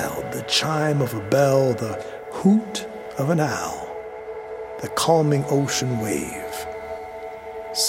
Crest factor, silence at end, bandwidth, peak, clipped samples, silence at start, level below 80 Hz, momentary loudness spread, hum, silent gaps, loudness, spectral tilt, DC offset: 18 dB; 0 s; 16.5 kHz; -4 dBFS; under 0.1%; 0 s; -54 dBFS; 15 LU; none; none; -23 LUFS; -4.5 dB/octave; under 0.1%